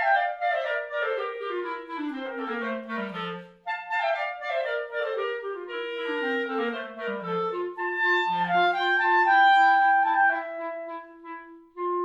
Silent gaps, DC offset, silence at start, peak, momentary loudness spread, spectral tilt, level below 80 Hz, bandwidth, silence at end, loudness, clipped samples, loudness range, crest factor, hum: none; under 0.1%; 0 s; -10 dBFS; 14 LU; -5 dB/octave; -76 dBFS; 7.6 kHz; 0 s; -26 LUFS; under 0.1%; 9 LU; 16 dB; none